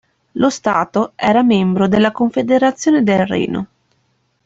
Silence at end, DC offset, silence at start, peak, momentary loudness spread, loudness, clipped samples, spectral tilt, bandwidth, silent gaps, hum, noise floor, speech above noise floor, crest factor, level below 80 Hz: 0.8 s; under 0.1%; 0.35 s; -2 dBFS; 7 LU; -15 LUFS; under 0.1%; -6 dB/octave; 8 kHz; none; none; -63 dBFS; 49 dB; 14 dB; -52 dBFS